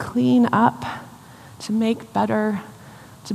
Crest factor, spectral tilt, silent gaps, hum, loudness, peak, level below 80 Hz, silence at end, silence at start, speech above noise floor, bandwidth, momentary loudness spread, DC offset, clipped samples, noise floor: 18 dB; -6.5 dB/octave; none; none; -21 LUFS; -4 dBFS; -60 dBFS; 0 s; 0 s; 24 dB; 14 kHz; 19 LU; under 0.1%; under 0.1%; -43 dBFS